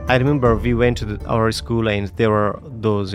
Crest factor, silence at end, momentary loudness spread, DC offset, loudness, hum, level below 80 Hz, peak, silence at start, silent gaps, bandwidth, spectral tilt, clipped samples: 16 dB; 0 s; 6 LU; under 0.1%; -19 LUFS; none; -32 dBFS; -2 dBFS; 0 s; none; 14 kHz; -7 dB/octave; under 0.1%